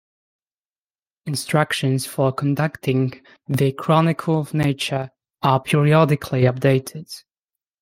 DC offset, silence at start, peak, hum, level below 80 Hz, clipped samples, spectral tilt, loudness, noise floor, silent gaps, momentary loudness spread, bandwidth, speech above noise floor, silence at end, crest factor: under 0.1%; 1.25 s; -2 dBFS; none; -58 dBFS; under 0.1%; -6.5 dB/octave; -20 LUFS; under -90 dBFS; none; 11 LU; 16 kHz; over 71 dB; 0.65 s; 18 dB